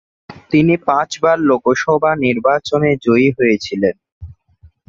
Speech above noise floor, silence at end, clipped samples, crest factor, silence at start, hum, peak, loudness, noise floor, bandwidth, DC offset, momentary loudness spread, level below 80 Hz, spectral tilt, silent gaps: 35 dB; 0.55 s; under 0.1%; 16 dB; 0.3 s; none; 0 dBFS; -15 LUFS; -49 dBFS; 7.8 kHz; under 0.1%; 4 LU; -48 dBFS; -6.5 dB/octave; 4.12-4.21 s